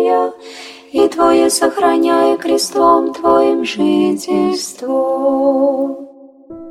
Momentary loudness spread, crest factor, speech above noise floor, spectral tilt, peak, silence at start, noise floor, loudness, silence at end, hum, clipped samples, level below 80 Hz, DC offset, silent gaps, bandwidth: 10 LU; 14 dB; 23 dB; -4 dB/octave; 0 dBFS; 0 s; -37 dBFS; -14 LUFS; 0 s; none; under 0.1%; -52 dBFS; under 0.1%; none; 15.5 kHz